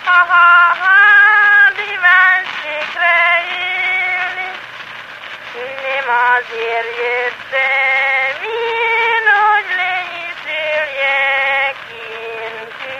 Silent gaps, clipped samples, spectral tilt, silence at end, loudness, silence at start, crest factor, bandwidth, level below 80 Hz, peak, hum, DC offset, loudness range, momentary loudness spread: none; under 0.1%; -1.5 dB/octave; 0 s; -12 LUFS; 0 s; 14 dB; 14 kHz; -64 dBFS; 0 dBFS; none; under 0.1%; 8 LU; 19 LU